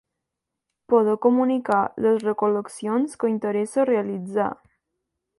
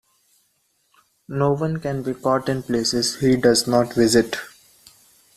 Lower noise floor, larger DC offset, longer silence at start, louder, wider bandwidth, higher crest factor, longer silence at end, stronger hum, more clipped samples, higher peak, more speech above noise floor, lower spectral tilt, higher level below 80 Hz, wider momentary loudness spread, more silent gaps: first, -83 dBFS vs -67 dBFS; neither; second, 0.9 s vs 1.3 s; about the same, -22 LUFS vs -20 LUFS; second, 11.5 kHz vs 14.5 kHz; about the same, 18 dB vs 20 dB; about the same, 0.85 s vs 0.9 s; neither; neither; second, -6 dBFS vs -2 dBFS; first, 62 dB vs 47 dB; first, -7 dB/octave vs -4.5 dB/octave; second, -68 dBFS vs -52 dBFS; second, 7 LU vs 10 LU; neither